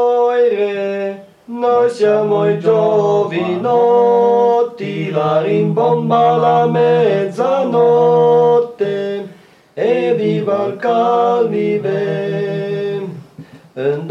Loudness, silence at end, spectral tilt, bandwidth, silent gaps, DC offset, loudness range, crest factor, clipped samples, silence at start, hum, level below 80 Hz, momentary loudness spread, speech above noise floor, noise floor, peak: -14 LUFS; 0 s; -7.5 dB/octave; 7.4 kHz; none; under 0.1%; 4 LU; 12 dB; under 0.1%; 0 s; none; -68 dBFS; 11 LU; 29 dB; -42 dBFS; -2 dBFS